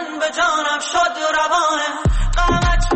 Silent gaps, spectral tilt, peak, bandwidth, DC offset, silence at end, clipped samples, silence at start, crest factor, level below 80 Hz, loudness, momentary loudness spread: none; -4 dB/octave; -6 dBFS; 8.8 kHz; under 0.1%; 0 s; under 0.1%; 0 s; 10 dB; -22 dBFS; -18 LUFS; 3 LU